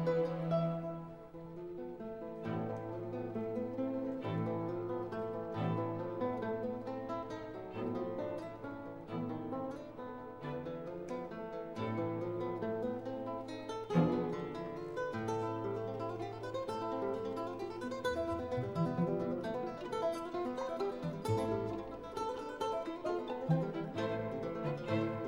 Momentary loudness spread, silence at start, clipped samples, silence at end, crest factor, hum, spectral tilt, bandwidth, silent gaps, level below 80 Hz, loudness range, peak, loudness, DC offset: 9 LU; 0 s; under 0.1%; 0 s; 20 dB; none; -7.5 dB/octave; 16 kHz; none; -66 dBFS; 4 LU; -18 dBFS; -39 LUFS; under 0.1%